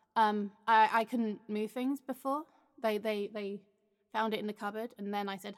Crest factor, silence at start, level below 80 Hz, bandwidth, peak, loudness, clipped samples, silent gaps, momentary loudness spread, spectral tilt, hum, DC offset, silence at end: 20 dB; 0.15 s; under -90 dBFS; 16 kHz; -14 dBFS; -34 LUFS; under 0.1%; none; 12 LU; -5.5 dB/octave; none; under 0.1%; 0.05 s